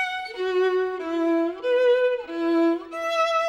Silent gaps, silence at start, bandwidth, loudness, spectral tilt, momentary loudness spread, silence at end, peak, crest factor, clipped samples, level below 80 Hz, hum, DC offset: none; 0 s; 9.6 kHz; -23 LUFS; -3 dB/octave; 7 LU; 0 s; -12 dBFS; 12 dB; under 0.1%; -64 dBFS; none; under 0.1%